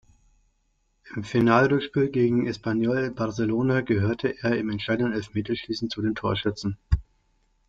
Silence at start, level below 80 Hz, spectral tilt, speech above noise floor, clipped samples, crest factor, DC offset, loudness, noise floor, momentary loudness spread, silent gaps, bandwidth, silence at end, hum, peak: 1.05 s; -42 dBFS; -7 dB/octave; 45 dB; under 0.1%; 20 dB; under 0.1%; -25 LUFS; -70 dBFS; 9 LU; none; 7.8 kHz; 0.65 s; none; -6 dBFS